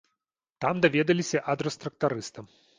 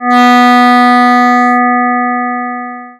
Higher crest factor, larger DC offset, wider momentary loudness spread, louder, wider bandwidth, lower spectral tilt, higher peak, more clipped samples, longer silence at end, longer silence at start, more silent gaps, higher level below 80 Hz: first, 22 dB vs 8 dB; neither; about the same, 10 LU vs 11 LU; second, -27 LUFS vs -8 LUFS; second, 9.8 kHz vs 13 kHz; first, -5 dB/octave vs -3.5 dB/octave; second, -6 dBFS vs -2 dBFS; neither; first, 0.35 s vs 0.05 s; first, 0.6 s vs 0 s; neither; first, -66 dBFS vs -76 dBFS